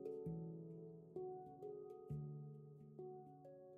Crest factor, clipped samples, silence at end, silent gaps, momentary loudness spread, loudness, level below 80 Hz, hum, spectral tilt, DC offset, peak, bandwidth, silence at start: 14 dB; under 0.1%; 0 s; none; 10 LU; -54 LUFS; -76 dBFS; none; -11.5 dB/octave; under 0.1%; -38 dBFS; 2.8 kHz; 0 s